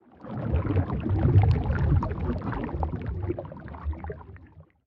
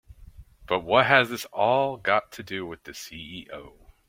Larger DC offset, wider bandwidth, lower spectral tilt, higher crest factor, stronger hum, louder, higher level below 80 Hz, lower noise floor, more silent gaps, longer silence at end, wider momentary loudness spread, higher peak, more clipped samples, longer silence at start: neither; second, 5 kHz vs 16.5 kHz; first, -11 dB/octave vs -4 dB/octave; second, 18 dB vs 24 dB; neither; second, -27 LUFS vs -24 LUFS; first, -36 dBFS vs -56 dBFS; about the same, -51 dBFS vs -48 dBFS; neither; second, 0.25 s vs 0.4 s; about the same, 17 LU vs 19 LU; second, -10 dBFS vs -2 dBFS; neither; second, 0.2 s vs 0.4 s